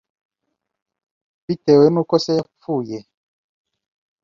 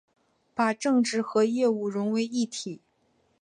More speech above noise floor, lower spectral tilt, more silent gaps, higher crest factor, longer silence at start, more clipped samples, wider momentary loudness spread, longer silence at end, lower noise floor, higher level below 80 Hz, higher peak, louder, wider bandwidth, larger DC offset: first, 61 dB vs 43 dB; first, -7 dB/octave vs -4.5 dB/octave; neither; about the same, 20 dB vs 16 dB; first, 1.5 s vs 0.55 s; neither; about the same, 15 LU vs 13 LU; first, 1.25 s vs 0.65 s; first, -78 dBFS vs -69 dBFS; first, -62 dBFS vs -78 dBFS; first, -2 dBFS vs -10 dBFS; first, -18 LUFS vs -26 LUFS; second, 7.4 kHz vs 10.5 kHz; neither